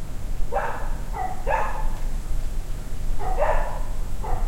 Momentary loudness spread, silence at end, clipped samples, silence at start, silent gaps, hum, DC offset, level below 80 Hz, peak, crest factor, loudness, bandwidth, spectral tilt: 10 LU; 0 s; under 0.1%; 0 s; none; none; under 0.1%; -26 dBFS; -8 dBFS; 14 dB; -30 LUFS; 13.5 kHz; -5.5 dB/octave